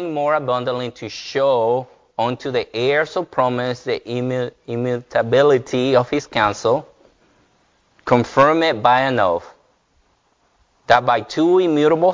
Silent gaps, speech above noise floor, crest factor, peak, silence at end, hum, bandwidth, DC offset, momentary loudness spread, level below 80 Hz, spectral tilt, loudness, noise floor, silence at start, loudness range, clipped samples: none; 44 dB; 18 dB; 0 dBFS; 0 s; none; 7.6 kHz; under 0.1%; 10 LU; -54 dBFS; -6 dB/octave; -18 LUFS; -62 dBFS; 0 s; 3 LU; under 0.1%